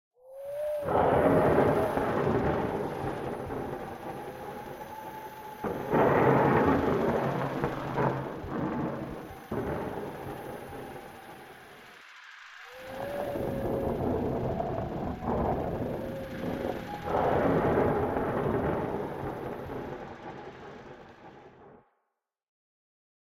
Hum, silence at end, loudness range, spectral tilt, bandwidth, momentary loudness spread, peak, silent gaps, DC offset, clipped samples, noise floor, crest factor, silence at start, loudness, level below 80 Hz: none; 1.45 s; 13 LU; -8 dB/octave; 16.5 kHz; 22 LU; -10 dBFS; none; under 0.1%; under 0.1%; -83 dBFS; 20 dB; 0.25 s; -30 LUFS; -50 dBFS